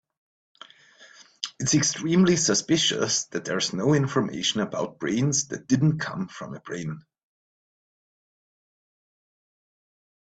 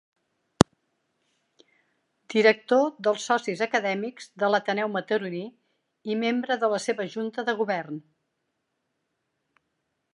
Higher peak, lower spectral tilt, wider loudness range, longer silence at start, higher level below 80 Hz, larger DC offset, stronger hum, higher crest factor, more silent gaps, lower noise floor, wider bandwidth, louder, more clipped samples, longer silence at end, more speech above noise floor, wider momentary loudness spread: second, -8 dBFS vs 0 dBFS; about the same, -4 dB/octave vs -5 dB/octave; first, 16 LU vs 6 LU; first, 1 s vs 0.6 s; second, -62 dBFS vs -56 dBFS; neither; neither; second, 20 dB vs 28 dB; neither; second, -53 dBFS vs -78 dBFS; second, 9.2 kHz vs 11.5 kHz; about the same, -24 LUFS vs -26 LUFS; neither; first, 3.3 s vs 2.15 s; second, 28 dB vs 53 dB; about the same, 14 LU vs 13 LU